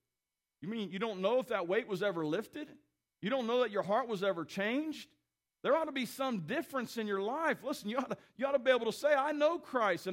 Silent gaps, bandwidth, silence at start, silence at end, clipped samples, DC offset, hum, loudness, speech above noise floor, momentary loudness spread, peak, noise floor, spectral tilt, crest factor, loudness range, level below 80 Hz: none; 16 kHz; 0.6 s; 0 s; under 0.1%; under 0.1%; none; -34 LUFS; over 56 dB; 10 LU; -16 dBFS; under -90 dBFS; -5 dB/octave; 18 dB; 3 LU; -82 dBFS